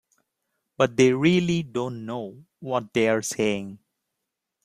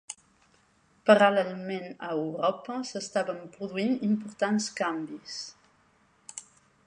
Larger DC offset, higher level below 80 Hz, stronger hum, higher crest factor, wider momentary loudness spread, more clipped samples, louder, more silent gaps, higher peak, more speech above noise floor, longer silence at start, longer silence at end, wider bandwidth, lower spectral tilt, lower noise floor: neither; first, -62 dBFS vs -76 dBFS; neither; about the same, 20 dB vs 24 dB; second, 15 LU vs 21 LU; neither; first, -24 LUFS vs -28 LUFS; neither; about the same, -6 dBFS vs -6 dBFS; first, 59 dB vs 37 dB; first, 0.8 s vs 0.1 s; first, 0.9 s vs 0.45 s; first, 15 kHz vs 10.5 kHz; about the same, -5.5 dB/octave vs -4.5 dB/octave; first, -83 dBFS vs -65 dBFS